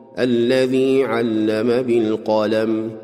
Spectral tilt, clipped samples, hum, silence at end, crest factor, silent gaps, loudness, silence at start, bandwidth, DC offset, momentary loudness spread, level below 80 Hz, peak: -6.5 dB/octave; under 0.1%; none; 0 s; 12 dB; none; -18 LUFS; 0 s; 13 kHz; under 0.1%; 3 LU; -62 dBFS; -6 dBFS